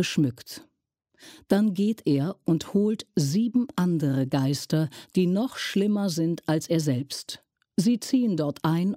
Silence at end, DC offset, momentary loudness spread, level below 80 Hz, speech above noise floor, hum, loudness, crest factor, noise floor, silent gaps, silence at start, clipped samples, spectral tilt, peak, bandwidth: 0 s; under 0.1%; 6 LU; -66 dBFS; 50 dB; none; -26 LUFS; 16 dB; -74 dBFS; none; 0 s; under 0.1%; -6 dB/octave; -10 dBFS; 16 kHz